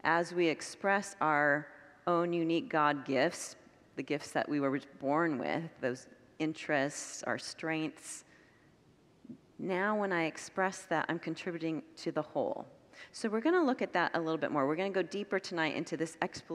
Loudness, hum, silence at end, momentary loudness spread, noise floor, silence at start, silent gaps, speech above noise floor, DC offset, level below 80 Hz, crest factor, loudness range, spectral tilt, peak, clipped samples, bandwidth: -34 LUFS; none; 0 s; 13 LU; -65 dBFS; 0.05 s; none; 31 dB; under 0.1%; -80 dBFS; 22 dB; 6 LU; -4.5 dB/octave; -12 dBFS; under 0.1%; 13 kHz